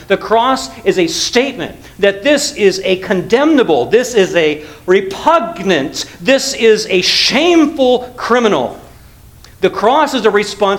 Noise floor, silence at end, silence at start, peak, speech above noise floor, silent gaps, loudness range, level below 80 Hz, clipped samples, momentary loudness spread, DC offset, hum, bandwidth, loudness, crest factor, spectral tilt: -39 dBFS; 0 s; 0 s; 0 dBFS; 27 dB; none; 2 LU; -46 dBFS; under 0.1%; 6 LU; under 0.1%; none; 17 kHz; -12 LUFS; 12 dB; -3.5 dB/octave